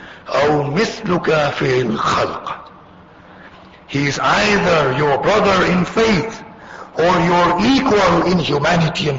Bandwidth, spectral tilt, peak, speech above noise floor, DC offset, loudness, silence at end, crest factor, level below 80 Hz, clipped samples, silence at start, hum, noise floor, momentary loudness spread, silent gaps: 8 kHz; -5.5 dB/octave; -4 dBFS; 27 dB; under 0.1%; -15 LUFS; 0 s; 14 dB; -42 dBFS; under 0.1%; 0 s; none; -42 dBFS; 12 LU; none